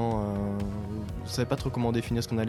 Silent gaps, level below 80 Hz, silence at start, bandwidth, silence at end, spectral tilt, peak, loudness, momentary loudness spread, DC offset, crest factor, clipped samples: none; -44 dBFS; 0 s; 14 kHz; 0 s; -6.5 dB/octave; -12 dBFS; -31 LUFS; 7 LU; under 0.1%; 18 dB; under 0.1%